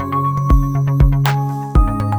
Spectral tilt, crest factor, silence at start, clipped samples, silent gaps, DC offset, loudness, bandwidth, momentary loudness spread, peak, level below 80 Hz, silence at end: -7.5 dB/octave; 12 dB; 0 s; under 0.1%; none; under 0.1%; -16 LUFS; over 20 kHz; 4 LU; -2 dBFS; -18 dBFS; 0 s